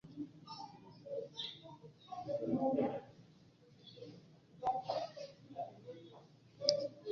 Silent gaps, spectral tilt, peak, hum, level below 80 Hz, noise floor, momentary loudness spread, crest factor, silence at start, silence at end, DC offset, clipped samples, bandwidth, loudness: none; -4 dB/octave; -10 dBFS; none; -78 dBFS; -64 dBFS; 23 LU; 32 dB; 0.05 s; 0 s; under 0.1%; under 0.1%; 7.2 kHz; -41 LUFS